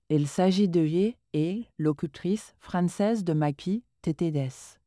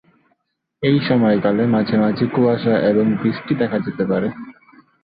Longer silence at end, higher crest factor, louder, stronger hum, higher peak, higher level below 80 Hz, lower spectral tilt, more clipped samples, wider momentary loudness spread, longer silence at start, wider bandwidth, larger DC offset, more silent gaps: second, 0.15 s vs 0.5 s; about the same, 14 dB vs 14 dB; second, -28 LUFS vs -18 LUFS; neither; second, -12 dBFS vs -4 dBFS; second, -62 dBFS vs -54 dBFS; second, -7 dB/octave vs -11.5 dB/octave; neither; about the same, 8 LU vs 6 LU; second, 0.1 s vs 0.8 s; first, 11 kHz vs 5 kHz; neither; neither